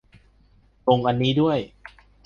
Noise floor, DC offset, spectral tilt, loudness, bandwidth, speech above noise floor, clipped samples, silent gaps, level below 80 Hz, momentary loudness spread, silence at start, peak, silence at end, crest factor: -57 dBFS; under 0.1%; -8 dB/octave; -22 LUFS; 7 kHz; 36 dB; under 0.1%; none; -54 dBFS; 8 LU; 0.85 s; -4 dBFS; 0.6 s; 20 dB